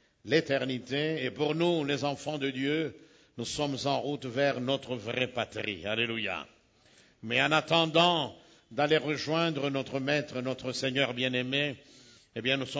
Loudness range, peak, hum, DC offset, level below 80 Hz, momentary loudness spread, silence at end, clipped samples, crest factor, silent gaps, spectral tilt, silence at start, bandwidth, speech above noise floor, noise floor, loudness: 4 LU; -10 dBFS; none; under 0.1%; -66 dBFS; 10 LU; 0 s; under 0.1%; 22 dB; none; -4.5 dB/octave; 0.25 s; 8 kHz; 32 dB; -62 dBFS; -30 LUFS